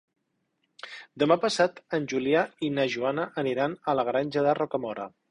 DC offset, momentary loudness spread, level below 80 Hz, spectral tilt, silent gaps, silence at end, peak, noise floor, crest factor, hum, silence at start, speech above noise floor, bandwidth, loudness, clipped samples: under 0.1%; 13 LU; -68 dBFS; -5 dB/octave; none; 0.2 s; -8 dBFS; -76 dBFS; 20 dB; none; 0.85 s; 49 dB; 11 kHz; -27 LUFS; under 0.1%